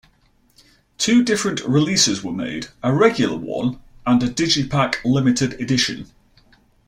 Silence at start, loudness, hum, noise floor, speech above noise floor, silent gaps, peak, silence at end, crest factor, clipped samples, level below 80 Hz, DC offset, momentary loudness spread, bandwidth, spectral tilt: 1 s; -19 LUFS; none; -58 dBFS; 40 dB; none; -2 dBFS; 0.85 s; 18 dB; under 0.1%; -50 dBFS; under 0.1%; 10 LU; 14 kHz; -4 dB/octave